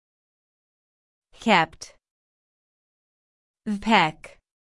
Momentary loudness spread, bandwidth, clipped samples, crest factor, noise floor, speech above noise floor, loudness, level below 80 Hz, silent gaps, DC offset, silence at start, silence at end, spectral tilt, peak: 21 LU; 12 kHz; under 0.1%; 24 dB; under -90 dBFS; over 68 dB; -22 LUFS; -58 dBFS; 2.11-3.54 s; under 0.1%; 1.4 s; 0.35 s; -4.5 dB/octave; -4 dBFS